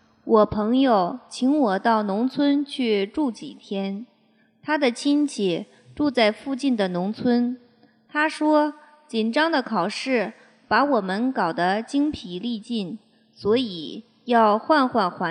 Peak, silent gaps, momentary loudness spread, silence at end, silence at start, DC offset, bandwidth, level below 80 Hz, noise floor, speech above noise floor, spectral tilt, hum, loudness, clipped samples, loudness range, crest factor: -4 dBFS; none; 11 LU; 0 s; 0.25 s; under 0.1%; 10.5 kHz; -60 dBFS; -61 dBFS; 39 dB; -5.5 dB/octave; none; -23 LUFS; under 0.1%; 3 LU; 18 dB